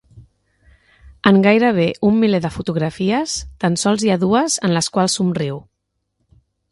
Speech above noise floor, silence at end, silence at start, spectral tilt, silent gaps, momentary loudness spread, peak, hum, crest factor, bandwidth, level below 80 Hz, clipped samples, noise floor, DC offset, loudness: 57 dB; 1.1 s; 0.15 s; -5 dB/octave; none; 9 LU; 0 dBFS; none; 18 dB; 11.5 kHz; -48 dBFS; under 0.1%; -74 dBFS; under 0.1%; -17 LUFS